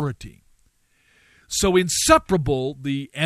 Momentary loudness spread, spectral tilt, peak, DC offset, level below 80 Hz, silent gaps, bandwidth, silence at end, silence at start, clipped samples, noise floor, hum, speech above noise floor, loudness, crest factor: 12 LU; -4 dB/octave; -2 dBFS; under 0.1%; -42 dBFS; none; 14 kHz; 0 s; 0 s; under 0.1%; -62 dBFS; none; 42 dB; -20 LUFS; 20 dB